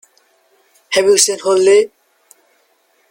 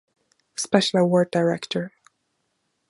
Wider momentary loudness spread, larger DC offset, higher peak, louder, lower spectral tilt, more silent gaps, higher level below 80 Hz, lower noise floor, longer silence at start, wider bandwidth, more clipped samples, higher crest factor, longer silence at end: second, 7 LU vs 14 LU; neither; about the same, 0 dBFS vs -2 dBFS; first, -13 LUFS vs -22 LUFS; second, -1.5 dB/octave vs -5 dB/octave; neither; first, -60 dBFS vs -70 dBFS; second, -58 dBFS vs -74 dBFS; first, 0.9 s vs 0.6 s; first, 17 kHz vs 11.5 kHz; neither; second, 16 dB vs 22 dB; first, 1.25 s vs 1 s